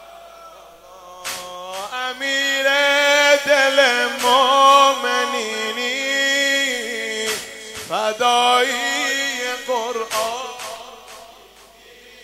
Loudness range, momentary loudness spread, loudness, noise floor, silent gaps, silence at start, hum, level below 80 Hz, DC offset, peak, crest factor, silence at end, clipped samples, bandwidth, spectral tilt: 7 LU; 16 LU; -17 LUFS; -46 dBFS; none; 0 s; none; -62 dBFS; under 0.1%; 0 dBFS; 18 dB; 0.95 s; under 0.1%; 16 kHz; 0 dB/octave